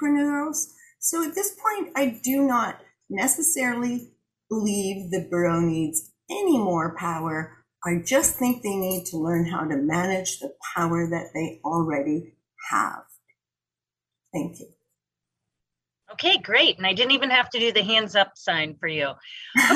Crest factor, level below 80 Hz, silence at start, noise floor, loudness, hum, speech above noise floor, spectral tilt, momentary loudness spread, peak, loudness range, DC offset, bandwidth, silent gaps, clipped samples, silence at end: 20 dB; -60 dBFS; 0 s; under -90 dBFS; -24 LUFS; none; over 66 dB; -3 dB/octave; 13 LU; -4 dBFS; 9 LU; under 0.1%; 15.5 kHz; none; under 0.1%; 0 s